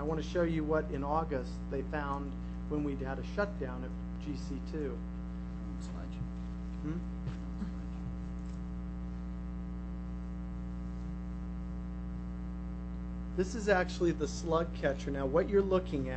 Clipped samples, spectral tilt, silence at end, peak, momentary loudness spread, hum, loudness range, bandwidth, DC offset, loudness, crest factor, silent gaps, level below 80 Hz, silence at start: under 0.1%; -7 dB/octave; 0 s; -14 dBFS; 10 LU; 60 Hz at -40 dBFS; 8 LU; 8.4 kHz; under 0.1%; -37 LUFS; 22 dB; none; -42 dBFS; 0 s